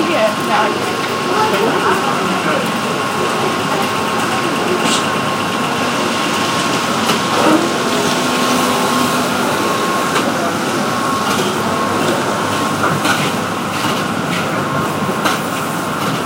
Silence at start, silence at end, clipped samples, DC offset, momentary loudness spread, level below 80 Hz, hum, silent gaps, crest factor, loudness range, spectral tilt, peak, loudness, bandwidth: 0 s; 0 s; under 0.1%; under 0.1%; 4 LU; -52 dBFS; none; none; 16 dB; 2 LU; -3.5 dB/octave; 0 dBFS; -15 LUFS; 16 kHz